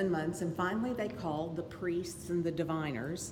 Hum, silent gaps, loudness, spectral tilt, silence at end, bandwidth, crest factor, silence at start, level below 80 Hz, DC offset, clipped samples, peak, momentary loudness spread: none; none; -36 LUFS; -6 dB/octave; 0 s; 17.5 kHz; 16 dB; 0 s; -62 dBFS; under 0.1%; under 0.1%; -20 dBFS; 4 LU